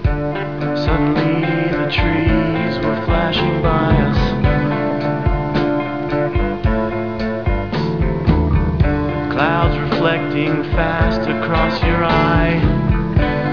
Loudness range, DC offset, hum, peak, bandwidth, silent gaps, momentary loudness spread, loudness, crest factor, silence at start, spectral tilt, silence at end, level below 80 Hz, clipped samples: 2 LU; 1%; none; -2 dBFS; 5.4 kHz; none; 5 LU; -17 LUFS; 14 dB; 0 s; -8.5 dB/octave; 0 s; -24 dBFS; under 0.1%